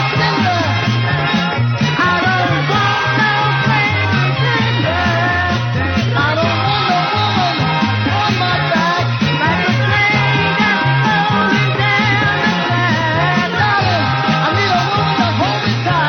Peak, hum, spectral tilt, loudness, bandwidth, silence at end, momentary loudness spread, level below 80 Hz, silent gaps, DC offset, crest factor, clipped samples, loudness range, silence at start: -2 dBFS; none; -6 dB/octave; -14 LUFS; 16.5 kHz; 0 s; 2 LU; -44 dBFS; none; under 0.1%; 12 dB; under 0.1%; 2 LU; 0 s